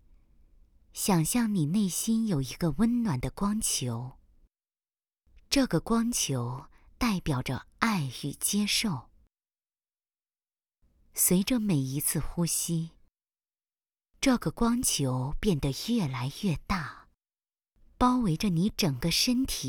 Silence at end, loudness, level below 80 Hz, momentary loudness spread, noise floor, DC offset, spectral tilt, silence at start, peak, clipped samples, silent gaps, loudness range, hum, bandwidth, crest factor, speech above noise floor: 0 s; -28 LUFS; -46 dBFS; 8 LU; under -90 dBFS; under 0.1%; -4.5 dB/octave; 0.95 s; -8 dBFS; under 0.1%; none; 3 LU; none; over 20 kHz; 22 dB; over 62 dB